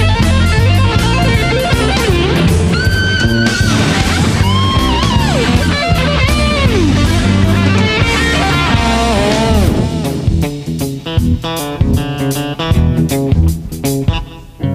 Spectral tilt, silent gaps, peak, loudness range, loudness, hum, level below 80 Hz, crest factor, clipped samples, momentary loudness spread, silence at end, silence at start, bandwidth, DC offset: -5.5 dB/octave; none; 0 dBFS; 4 LU; -12 LUFS; none; -20 dBFS; 12 dB; under 0.1%; 6 LU; 0 s; 0 s; 15.5 kHz; under 0.1%